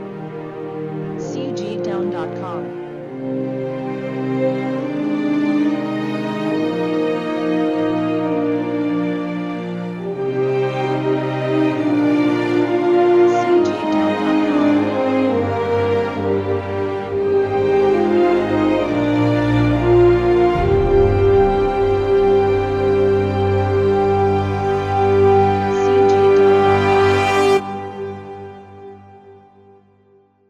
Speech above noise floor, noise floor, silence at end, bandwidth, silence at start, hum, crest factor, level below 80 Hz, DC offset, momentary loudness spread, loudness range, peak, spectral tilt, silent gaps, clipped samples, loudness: 30 dB; -54 dBFS; 1.15 s; 9.6 kHz; 0 s; none; 14 dB; -38 dBFS; under 0.1%; 12 LU; 8 LU; -2 dBFS; -7.5 dB/octave; none; under 0.1%; -17 LUFS